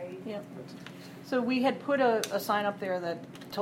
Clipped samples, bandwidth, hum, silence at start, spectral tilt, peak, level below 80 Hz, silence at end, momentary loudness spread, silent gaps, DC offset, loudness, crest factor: under 0.1%; 17 kHz; none; 0 s; -4.5 dB/octave; -14 dBFS; -74 dBFS; 0 s; 18 LU; none; under 0.1%; -30 LUFS; 18 dB